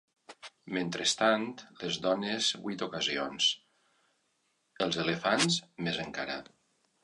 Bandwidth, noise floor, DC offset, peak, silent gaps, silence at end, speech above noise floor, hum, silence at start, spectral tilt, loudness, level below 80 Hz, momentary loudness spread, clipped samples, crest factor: 11 kHz; -76 dBFS; under 0.1%; -12 dBFS; none; 0.6 s; 44 dB; none; 0.3 s; -3 dB/octave; -31 LUFS; -70 dBFS; 13 LU; under 0.1%; 22 dB